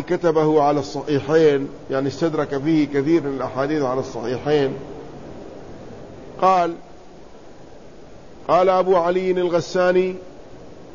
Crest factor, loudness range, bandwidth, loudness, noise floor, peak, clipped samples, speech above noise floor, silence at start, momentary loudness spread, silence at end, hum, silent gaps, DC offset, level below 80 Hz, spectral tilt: 16 dB; 6 LU; 7.4 kHz; -20 LUFS; -43 dBFS; -4 dBFS; under 0.1%; 24 dB; 0 s; 21 LU; 0 s; none; none; 0.7%; -52 dBFS; -6.5 dB/octave